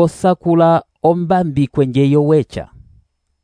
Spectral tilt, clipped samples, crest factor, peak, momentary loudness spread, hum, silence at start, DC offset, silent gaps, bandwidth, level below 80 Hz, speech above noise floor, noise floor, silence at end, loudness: -8.5 dB/octave; under 0.1%; 14 dB; -2 dBFS; 5 LU; none; 0 s; under 0.1%; none; 11 kHz; -46 dBFS; 41 dB; -54 dBFS; 0.8 s; -14 LUFS